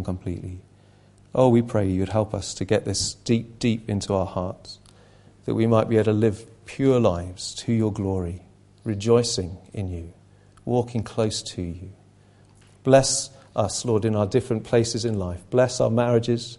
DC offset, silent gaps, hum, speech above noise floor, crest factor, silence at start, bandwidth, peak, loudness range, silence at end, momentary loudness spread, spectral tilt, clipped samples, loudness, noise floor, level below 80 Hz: under 0.1%; none; 50 Hz at -50 dBFS; 31 dB; 22 dB; 0 s; 11.5 kHz; -2 dBFS; 4 LU; 0.05 s; 16 LU; -5.5 dB/octave; under 0.1%; -23 LUFS; -54 dBFS; -44 dBFS